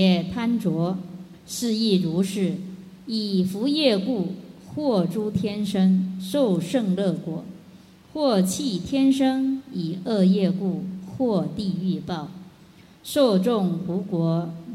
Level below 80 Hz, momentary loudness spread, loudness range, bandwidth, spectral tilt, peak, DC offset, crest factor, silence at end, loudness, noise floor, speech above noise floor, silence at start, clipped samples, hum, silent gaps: -58 dBFS; 14 LU; 2 LU; 14.5 kHz; -6.5 dB/octave; -6 dBFS; under 0.1%; 16 dB; 0 s; -24 LUFS; -50 dBFS; 28 dB; 0 s; under 0.1%; none; none